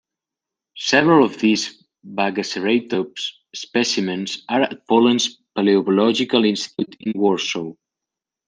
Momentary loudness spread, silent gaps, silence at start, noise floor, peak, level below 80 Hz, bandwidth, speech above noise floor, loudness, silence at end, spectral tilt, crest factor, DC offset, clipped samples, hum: 12 LU; none; 0.75 s; -86 dBFS; 0 dBFS; -68 dBFS; 10 kHz; 68 dB; -19 LUFS; 0.75 s; -4 dB/octave; 18 dB; under 0.1%; under 0.1%; none